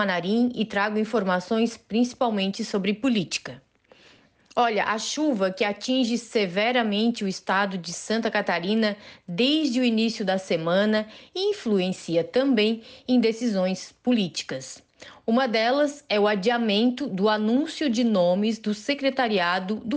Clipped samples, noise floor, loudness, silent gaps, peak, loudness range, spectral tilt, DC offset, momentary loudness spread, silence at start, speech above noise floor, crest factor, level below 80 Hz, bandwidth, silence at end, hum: under 0.1%; -56 dBFS; -24 LUFS; none; -12 dBFS; 3 LU; -4.5 dB/octave; under 0.1%; 6 LU; 0 s; 32 dB; 12 dB; -68 dBFS; 9.6 kHz; 0 s; none